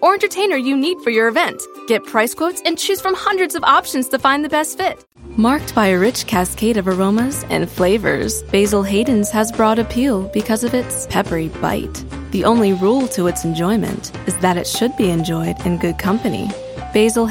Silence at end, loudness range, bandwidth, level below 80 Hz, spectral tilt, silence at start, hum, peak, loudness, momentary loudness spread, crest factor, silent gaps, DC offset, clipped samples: 0 s; 2 LU; 17 kHz; -38 dBFS; -4.5 dB/octave; 0 s; none; 0 dBFS; -17 LUFS; 7 LU; 16 dB; none; under 0.1%; under 0.1%